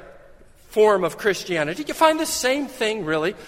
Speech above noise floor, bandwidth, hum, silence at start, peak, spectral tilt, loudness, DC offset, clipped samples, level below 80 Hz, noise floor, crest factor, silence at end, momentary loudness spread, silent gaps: 27 dB; 16.5 kHz; none; 0 s; -2 dBFS; -3.5 dB/octave; -21 LUFS; under 0.1%; under 0.1%; -54 dBFS; -48 dBFS; 20 dB; 0 s; 6 LU; none